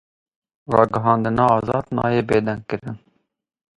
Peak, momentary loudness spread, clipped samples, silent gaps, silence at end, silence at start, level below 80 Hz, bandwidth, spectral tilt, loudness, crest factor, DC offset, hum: 0 dBFS; 12 LU; under 0.1%; none; 0.8 s; 0.7 s; -50 dBFS; 11.5 kHz; -8.5 dB/octave; -20 LUFS; 20 dB; under 0.1%; none